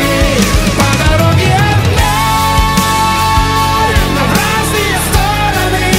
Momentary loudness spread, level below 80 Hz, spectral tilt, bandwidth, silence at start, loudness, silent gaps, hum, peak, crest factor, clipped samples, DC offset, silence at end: 2 LU; -18 dBFS; -4.5 dB/octave; 16.5 kHz; 0 s; -10 LUFS; none; none; 0 dBFS; 10 dB; under 0.1%; under 0.1%; 0 s